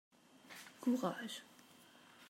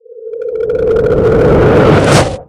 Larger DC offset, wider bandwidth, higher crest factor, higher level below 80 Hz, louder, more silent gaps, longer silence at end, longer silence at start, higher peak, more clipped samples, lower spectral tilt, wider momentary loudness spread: neither; first, 16 kHz vs 14.5 kHz; first, 22 dB vs 10 dB; second, under -90 dBFS vs -26 dBFS; second, -41 LUFS vs -9 LUFS; neither; about the same, 0 s vs 0.05 s; first, 0.35 s vs 0.1 s; second, -24 dBFS vs 0 dBFS; second, under 0.1% vs 0.3%; second, -4.5 dB/octave vs -6.5 dB/octave; first, 24 LU vs 13 LU